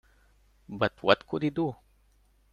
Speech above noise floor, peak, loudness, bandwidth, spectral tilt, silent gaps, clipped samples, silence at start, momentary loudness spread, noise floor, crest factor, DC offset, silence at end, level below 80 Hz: 37 dB; -6 dBFS; -28 LUFS; 10.5 kHz; -7 dB/octave; none; under 0.1%; 0.7 s; 17 LU; -65 dBFS; 26 dB; under 0.1%; 0.8 s; -62 dBFS